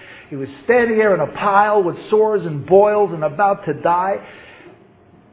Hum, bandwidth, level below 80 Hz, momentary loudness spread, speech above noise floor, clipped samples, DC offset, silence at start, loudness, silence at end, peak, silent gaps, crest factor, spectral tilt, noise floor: none; 4 kHz; -56 dBFS; 13 LU; 32 dB; under 0.1%; under 0.1%; 0 s; -16 LUFS; 0.95 s; 0 dBFS; none; 16 dB; -10.5 dB/octave; -48 dBFS